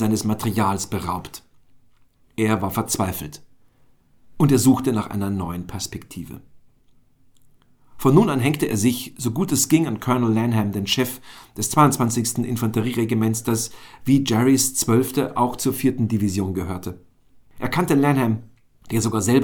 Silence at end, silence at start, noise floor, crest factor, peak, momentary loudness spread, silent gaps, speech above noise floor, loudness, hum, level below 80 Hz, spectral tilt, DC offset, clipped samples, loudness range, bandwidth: 0 s; 0 s; -55 dBFS; 20 dB; -2 dBFS; 14 LU; none; 35 dB; -21 LUFS; none; -50 dBFS; -5 dB/octave; under 0.1%; under 0.1%; 5 LU; over 20 kHz